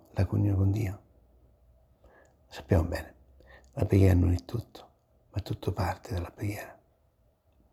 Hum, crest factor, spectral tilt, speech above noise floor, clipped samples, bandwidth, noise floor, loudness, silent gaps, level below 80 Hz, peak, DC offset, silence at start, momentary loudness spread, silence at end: none; 22 dB; -8 dB/octave; 40 dB; under 0.1%; 14 kHz; -68 dBFS; -29 LUFS; none; -46 dBFS; -10 dBFS; under 0.1%; 0.15 s; 23 LU; 1 s